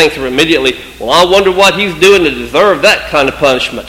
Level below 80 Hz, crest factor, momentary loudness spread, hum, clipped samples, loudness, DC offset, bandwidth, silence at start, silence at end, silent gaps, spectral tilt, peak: -34 dBFS; 10 dB; 5 LU; none; 1%; -8 LUFS; under 0.1%; 17 kHz; 0 s; 0 s; none; -3.5 dB/octave; 0 dBFS